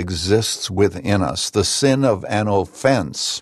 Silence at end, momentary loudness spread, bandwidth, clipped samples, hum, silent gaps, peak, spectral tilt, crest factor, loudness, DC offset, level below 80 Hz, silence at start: 0 s; 4 LU; 13 kHz; under 0.1%; none; none; -2 dBFS; -4.5 dB/octave; 18 dB; -18 LUFS; under 0.1%; -44 dBFS; 0 s